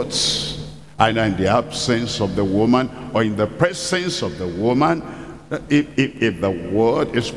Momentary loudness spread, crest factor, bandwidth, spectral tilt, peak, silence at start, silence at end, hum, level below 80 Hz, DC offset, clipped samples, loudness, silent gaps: 8 LU; 20 dB; 12 kHz; -5 dB/octave; 0 dBFS; 0 s; 0 s; none; -44 dBFS; 0.3%; under 0.1%; -20 LUFS; none